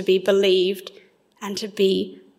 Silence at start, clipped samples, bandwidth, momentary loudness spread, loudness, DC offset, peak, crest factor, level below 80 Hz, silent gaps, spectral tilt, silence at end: 0 s; under 0.1%; 15.5 kHz; 16 LU; -21 LUFS; under 0.1%; -6 dBFS; 16 dB; -72 dBFS; none; -5 dB/octave; 0.25 s